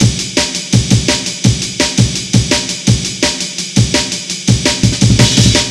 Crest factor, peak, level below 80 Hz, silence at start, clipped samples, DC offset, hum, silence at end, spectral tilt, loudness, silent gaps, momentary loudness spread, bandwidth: 12 dB; 0 dBFS; -28 dBFS; 0 s; under 0.1%; 0.2%; none; 0 s; -4 dB/octave; -12 LUFS; none; 5 LU; 13.5 kHz